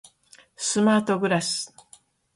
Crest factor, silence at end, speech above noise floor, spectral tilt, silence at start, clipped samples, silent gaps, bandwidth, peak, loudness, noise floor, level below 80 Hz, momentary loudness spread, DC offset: 18 dB; 0.7 s; 34 dB; -4 dB/octave; 0.6 s; under 0.1%; none; 11.5 kHz; -8 dBFS; -23 LUFS; -56 dBFS; -68 dBFS; 9 LU; under 0.1%